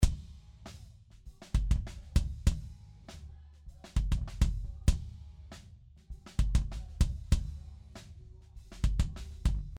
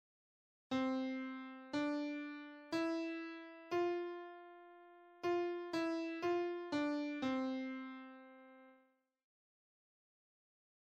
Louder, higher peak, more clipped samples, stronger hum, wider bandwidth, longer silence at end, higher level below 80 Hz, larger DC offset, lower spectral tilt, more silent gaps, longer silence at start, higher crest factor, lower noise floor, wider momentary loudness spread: first, -35 LUFS vs -41 LUFS; first, -12 dBFS vs -28 dBFS; neither; neither; first, 13 kHz vs 8.6 kHz; second, 0 s vs 2.15 s; first, -34 dBFS vs -84 dBFS; neither; about the same, -6 dB/octave vs -5 dB/octave; neither; second, 0 s vs 0.7 s; about the same, 20 dB vs 16 dB; second, -55 dBFS vs -75 dBFS; about the same, 21 LU vs 19 LU